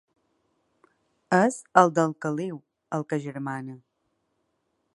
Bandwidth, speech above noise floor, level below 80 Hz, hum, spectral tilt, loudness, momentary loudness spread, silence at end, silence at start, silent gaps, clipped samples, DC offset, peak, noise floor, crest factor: 11.5 kHz; 51 dB; -78 dBFS; none; -6 dB/octave; -25 LUFS; 16 LU; 1.2 s; 1.3 s; none; under 0.1%; under 0.1%; -2 dBFS; -75 dBFS; 26 dB